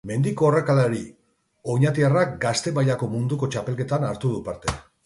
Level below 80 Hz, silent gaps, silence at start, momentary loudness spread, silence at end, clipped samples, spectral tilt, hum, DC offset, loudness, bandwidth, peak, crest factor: -48 dBFS; none; 0.05 s; 10 LU; 0.25 s; under 0.1%; -6.5 dB/octave; none; under 0.1%; -23 LUFS; 11.5 kHz; -6 dBFS; 16 dB